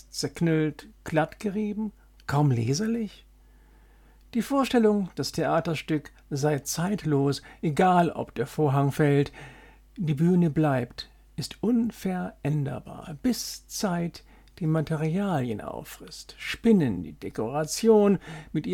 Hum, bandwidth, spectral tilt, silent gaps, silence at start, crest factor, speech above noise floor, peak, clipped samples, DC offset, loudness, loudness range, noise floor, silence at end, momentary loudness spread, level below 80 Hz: none; 17.5 kHz; -6 dB/octave; none; 0.15 s; 18 dB; 29 dB; -8 dBFS; under 0.1%; under 0.1%; -26 LUFS; 5 LU; -55 dBFS; 0 s; 14 LU; -54 dBFS